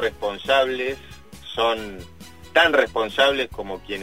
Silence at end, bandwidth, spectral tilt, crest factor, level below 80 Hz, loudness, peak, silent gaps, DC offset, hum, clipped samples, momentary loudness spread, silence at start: 0 s; 16 kHz; -3.5 dB/octave; 20 dB; -48 dBFS; -21 LUFS; -2 dBFS; none; 0.4%; none; under 0.1%; 18 LU; 0 s